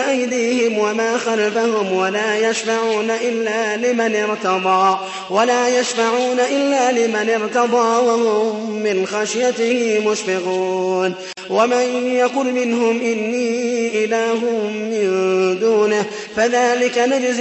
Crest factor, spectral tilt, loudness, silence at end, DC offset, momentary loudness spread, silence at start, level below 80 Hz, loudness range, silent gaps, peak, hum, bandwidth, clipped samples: 14 dB; -3.5 dB/octave; -17 LUFS; 0 s; under 0.1%; 5 LU; 0 s; -66 dBFS; 2 LU; none; -4 dBFS; none; 8.4 kHz; under 0.1%